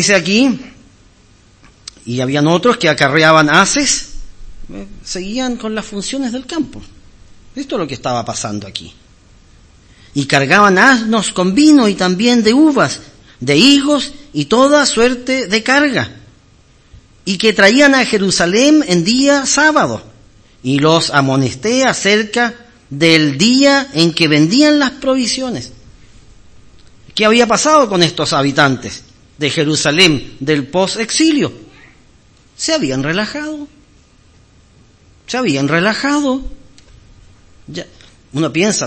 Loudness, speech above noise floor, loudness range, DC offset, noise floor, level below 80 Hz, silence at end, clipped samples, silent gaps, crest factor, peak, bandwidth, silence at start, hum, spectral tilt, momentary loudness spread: -12 LUFS; 35 dB; 10 LU; under 0.1%; -47 dBFS; -42 dBFS; 0 s; 0.3%; none; 14 dB; 0 dBFS; 11 kHz; 0 s; none; -4 dB/octave; 16 LU